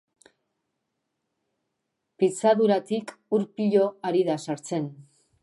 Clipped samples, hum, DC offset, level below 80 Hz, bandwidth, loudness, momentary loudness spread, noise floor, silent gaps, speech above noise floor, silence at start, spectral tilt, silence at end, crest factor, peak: under 0.1%; none; under 0.1%; -80 dBFS; 11.5 kHz; -25 LUFS; 10 LU; -80 dBFS; none; 56 dB; 2.2 s; -6 dB/octave; 0.4 s; 18 dB; -8 dBFS